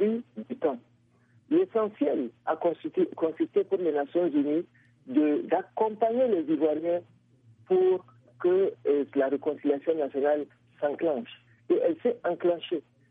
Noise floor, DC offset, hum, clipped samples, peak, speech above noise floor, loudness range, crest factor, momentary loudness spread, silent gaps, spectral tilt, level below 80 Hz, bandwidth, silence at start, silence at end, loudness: -64 dBFS; under 0.1%; none; under 0.1%; -12 dBFS; 37 dB; 2 LU; 16 dB; 7 LU; none; -9.5 dB/octave; -82 dBFS; 4.4 kHz; 0 s; 0.3 s; -28 LUFS